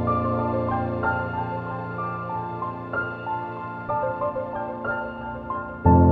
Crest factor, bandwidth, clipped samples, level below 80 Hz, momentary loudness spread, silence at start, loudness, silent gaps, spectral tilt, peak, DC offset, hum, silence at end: 20 dB; 4.7 kHz; under 0.1%; -40 dBFS; 8 LU; 0 s; -27 LUFS; none; -11 dB/octave; -4 dBFS; under 0.1%; none; 0 s